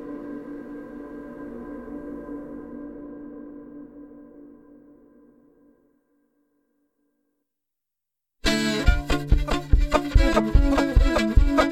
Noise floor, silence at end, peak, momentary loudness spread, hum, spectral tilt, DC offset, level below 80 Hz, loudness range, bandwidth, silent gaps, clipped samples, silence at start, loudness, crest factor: -86 dBFS; 0 s; -4 dBFS; 20 LU; none; -6 dB/octave; under 0.1%; -26 dBFS; 22 LU; 13.5 kHz; none; under 0.1%; 0 s; -24 LUFS; 22 dB